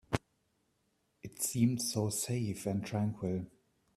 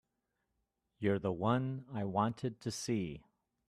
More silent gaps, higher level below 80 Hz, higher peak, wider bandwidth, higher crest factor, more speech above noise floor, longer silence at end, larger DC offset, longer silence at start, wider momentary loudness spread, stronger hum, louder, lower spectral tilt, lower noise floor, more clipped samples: neither; first, -64 dBFS vs -70 dBFS; first, -12 dBFS vs -18 dBFS; first, 15.5 kHz vs 13.5 kHz; about the same, 24 dB vs 20 dB; second, 44 dB vs 49 dB; about the same, 0.5 s vs 0.5 s; neither; second, 0.1 s vs 1 s; first, 13 LU vs 7 LU; neither; about the same, -35 LUFS vs -37 LUFS; about the same, -5 dB/octave vs -6 dB/octave; second, -77 dBFS vs -85 dBFS; neither